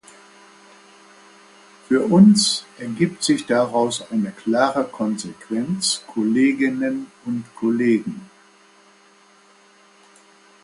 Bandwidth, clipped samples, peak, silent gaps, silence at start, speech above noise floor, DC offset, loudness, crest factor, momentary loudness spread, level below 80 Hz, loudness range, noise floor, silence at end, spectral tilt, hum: 11.5 kHz; under 0.1%; -2 dBFS; none; 1.9 s; 33 dB; under 0.1%; -20 LUFS; 20 dB; 15 LU; -64 dBFS; 8 LU; -53 dBFS; 2.4 s; -4.5 dB/octave; none